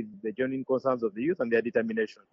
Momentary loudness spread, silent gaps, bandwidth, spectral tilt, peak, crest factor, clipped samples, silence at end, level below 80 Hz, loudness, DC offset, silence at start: 6 LU; none; 7.2 kHz; -5.5 dB/octave; -12 dBFS; 16 dB; under 0.1%; 0.2 s; -72 dBFS; -29 LUFS; under 0.1%; 0 s